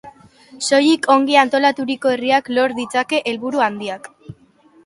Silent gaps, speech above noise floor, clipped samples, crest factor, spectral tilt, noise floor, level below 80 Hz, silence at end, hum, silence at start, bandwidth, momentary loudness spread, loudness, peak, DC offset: none; 35 dB; under 0.1%; 18 dB; -3 dB/octave; -52 dBFS; -64 dBFS; 0.55 s; none; 0.05 s; 11.5 kHz; 12 LU; -17 LUFS; 0 dBFS; under 0.1%